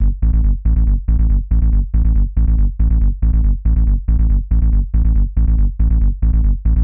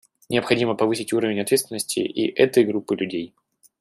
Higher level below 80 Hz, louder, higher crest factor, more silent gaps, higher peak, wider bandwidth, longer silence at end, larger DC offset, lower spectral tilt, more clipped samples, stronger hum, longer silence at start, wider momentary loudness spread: first, -12 dBFS vs -66 dBFS; first, -17 LUFS vs -22 LUFS; second, 8 dB vs 20 dB; neither; about the same, -4 dBFS vs -4 dBFS; second, 1.6 kHz vs 14 kHz; second, 0 s vs 0.55 s; first, 0.7% vs under 0.1%; first, -14 dB/octave vs -4.5 dB/octave; neither; neither; second, 0 s vs 0.3 s; second, 0 LU vs 7 LU